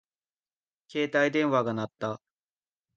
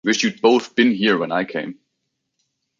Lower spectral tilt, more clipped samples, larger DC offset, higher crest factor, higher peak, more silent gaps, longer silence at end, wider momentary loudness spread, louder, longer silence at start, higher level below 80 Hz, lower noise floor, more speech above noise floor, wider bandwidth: first, -6 dB/octave vs -4 dB/octave; neither; neither; about the same, 18 dB vs 18 dB; second, -12 dBFS vs -2 dBFS; neither; second, 0.8 s vs 1.05 s; about the same, 12 LU vs 11 LU; second, -28 LUFS vs -18 LUFS; first, 0.95 s vs 0.05 s; second, -74 dBFS vs -66 dBFS; first, under -90 dBFS vs -76 dBFS; first, over 63 dB vs 57 dB; about the same, 7.6 kHz vs 7.6 kHz